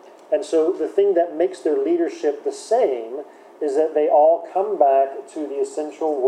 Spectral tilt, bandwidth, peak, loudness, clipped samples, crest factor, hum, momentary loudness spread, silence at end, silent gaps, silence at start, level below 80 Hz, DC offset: -4 dB/octave; 10.5 kHz; -4 dBFS; -20 LUFS; under 0.1%; 16 dB; none; 12 LU; 0 s; none; 0.3 s; under -90 dBFS; under 0.1%